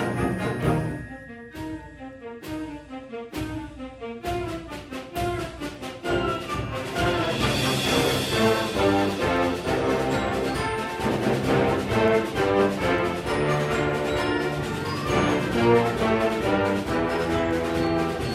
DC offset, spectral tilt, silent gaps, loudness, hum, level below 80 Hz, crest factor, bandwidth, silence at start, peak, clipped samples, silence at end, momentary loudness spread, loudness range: under 0.1%; -5.5 dB/octave; none; -24 LUFS; none; -42 dBFS; 16 dB; 16 kHz; 0 s; -8 dBFS; under 0.1%; 0 s; 14 LU; 10 LU